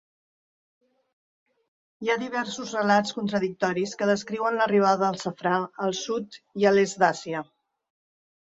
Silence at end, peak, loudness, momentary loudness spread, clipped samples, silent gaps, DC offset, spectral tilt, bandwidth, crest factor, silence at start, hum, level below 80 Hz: 1 s; -6 dBFS; -25 LUFS; 10 LU; under 0.1%; none; under 0.1%; -4.5 dB/octave; 8 kHz; 20 dB; 2 s; none; -70 dBFS